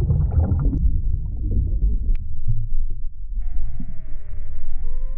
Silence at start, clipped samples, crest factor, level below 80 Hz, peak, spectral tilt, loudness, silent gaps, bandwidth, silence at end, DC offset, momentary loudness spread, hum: 0 s; under 0.1%; 10 dB; -20 dBFS; -8 dBFS; -13 dB/octave; -26 LUFS; none; 1.5 kHz; 0 s; under 0.1%; 15 LU; none